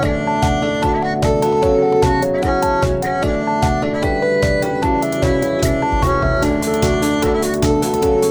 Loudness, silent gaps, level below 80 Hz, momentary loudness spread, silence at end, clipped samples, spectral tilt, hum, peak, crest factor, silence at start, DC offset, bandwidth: -17 LUFS; none; -26 dBFS; 3 LU; 0 s; under 0.1%; -6 dB/octave; none; -2 dBFS; 14 dB; 0 s; 0.2%; over 20 kHz